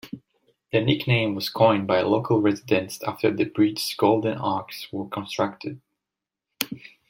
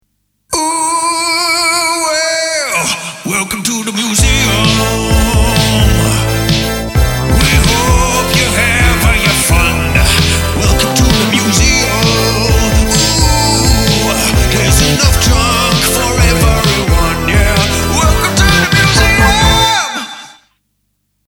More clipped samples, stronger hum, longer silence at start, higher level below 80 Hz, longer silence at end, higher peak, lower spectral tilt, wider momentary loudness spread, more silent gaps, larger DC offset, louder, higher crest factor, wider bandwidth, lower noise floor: neither; neither; second, 0.05 s vs 0.5 s; second, -62 dBFS vs -16 dBFS; second, 0.2 s vs 1 s; about the same, -2 dBFS vs 0 dBFS; first, -6 dB/octave vs -3.5 dB/octave; first, 11 LU vs 5 LU; neither; neither; second, -24 LUFS vs -10 LUFS; first, 22 dB vs 10 dB; second, 16.5 kHz vs over 20 kHz; first, -87 dBFS vs -64 dBFS